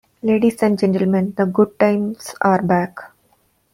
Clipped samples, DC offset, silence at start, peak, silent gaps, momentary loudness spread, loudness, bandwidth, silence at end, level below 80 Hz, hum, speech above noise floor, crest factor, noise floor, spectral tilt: under 0.1%; under 0.1%; 0.25 s; -2 dBFS; none; 7 LU; -18 LUFS; 16 kHz; 0.65 s; -58 dBFS; none; 44 dB; 16 dB; -61 dBFS; -7.5 dB/octave